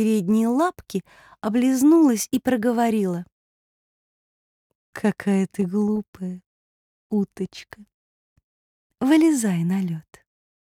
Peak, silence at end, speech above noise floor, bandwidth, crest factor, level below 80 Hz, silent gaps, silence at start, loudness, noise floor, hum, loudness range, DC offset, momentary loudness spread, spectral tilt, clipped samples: -8 dBFS; 0.6 s; over 69 dB; 17.5 kHz; 16 dB; -64 dBFS; 3.32-4.93 s, 6.08-6.13 s, 6.46-7.10 s, 7.94-8.36 s, 8.44-8.90 s; 0 s; -22 LUFS; under -90 dBFS; none; 7 LU; under 0.1%; 16 LU; -6 dB/octave; under 0.1%